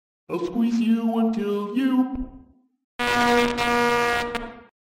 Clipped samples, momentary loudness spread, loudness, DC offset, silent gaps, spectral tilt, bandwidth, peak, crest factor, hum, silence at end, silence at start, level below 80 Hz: under 0.1%; 13 LU; -23 LUFS; under 0.1%; 2.84-2.99 s; -4.5 dB/octave; 16 kHz; -6 dBFS; 18 dB; none; 0.35 s; 0.3 s; -46 dBFS